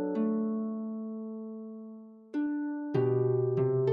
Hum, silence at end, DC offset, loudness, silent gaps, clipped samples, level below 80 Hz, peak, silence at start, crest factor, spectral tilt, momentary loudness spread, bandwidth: none; 0 s; under 0.1%; -32 LUFS; none; under 0.1%; -76 dBFS; -16 dBFS; 0 s; 16 dB; -11 dB/octave; 16 LU; 4.8 kHz